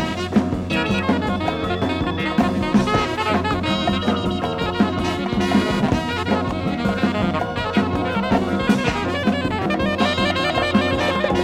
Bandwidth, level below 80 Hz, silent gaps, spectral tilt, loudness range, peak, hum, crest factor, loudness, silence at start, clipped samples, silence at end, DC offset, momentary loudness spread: 13.5 kHz; -40 dBFS; none; -6 dB/octave; 1 LU; -4 dBFS; none; 16 dB; -20 LUFS; 0 s; under 0.1%; 0 s; under 0.1%; 4 LU